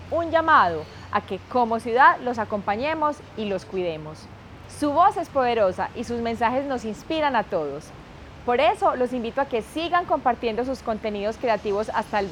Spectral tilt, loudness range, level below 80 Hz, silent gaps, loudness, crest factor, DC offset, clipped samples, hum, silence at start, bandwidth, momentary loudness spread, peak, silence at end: -5.5 dB/octave; 3 LU; -52 dBFS; none; -23 LUFS; 20 dB; under 0.1%; under 0.1%; none; 0 s; 15.5 kHz; 15 LU; -4 dBFS; 0 s